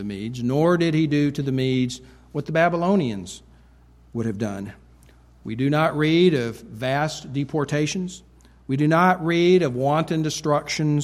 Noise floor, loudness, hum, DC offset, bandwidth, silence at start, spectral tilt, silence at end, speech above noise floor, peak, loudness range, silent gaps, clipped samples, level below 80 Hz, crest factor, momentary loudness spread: -52 dBFS; -22 LUFS; none; under 0.1%; 14 kHz; 0 s; -6 dB/octave; 0 s; 30 dB; -4 dBFS; 5 LU; none; under 0.1%; -52 dBFS; 18 dB; 16 LU